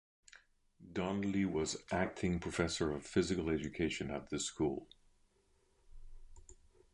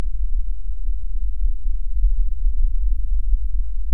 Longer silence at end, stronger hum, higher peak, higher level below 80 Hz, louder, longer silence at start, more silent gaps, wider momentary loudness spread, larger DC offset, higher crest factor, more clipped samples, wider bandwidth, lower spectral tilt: first, 0.4 s vs 0 s; neither; second, -18 dBFS vs -4 dBFS; second, -56 dBFS vs -20 dBFS; second, -38 LUFS vs -27 LUFS; first, 0.35 s vs 0 s; neither; about the same, 6 LU vs 5 LU; second, under 0.1% vs 10%; first, 20 dB vs 12 dB; neither; first, 11 kHz vs 0.1 kHz; second, -5 dB/octave vs -10 dB/octave